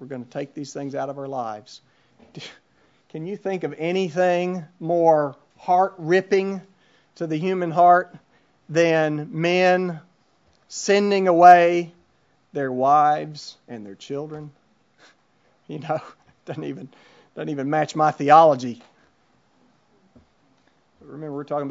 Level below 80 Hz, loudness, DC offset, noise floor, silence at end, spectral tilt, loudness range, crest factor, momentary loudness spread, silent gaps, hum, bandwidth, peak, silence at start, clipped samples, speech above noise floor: -74 dBFS; -20 LUFS; under 0.1%; -64 dBFS; 0 s; -5.5 dB/octave; 15 LU; 22 dB; 23 LU; none; none; 7.8 kHz; 0 dBFS; 0 s; under 0.1%; 43 dB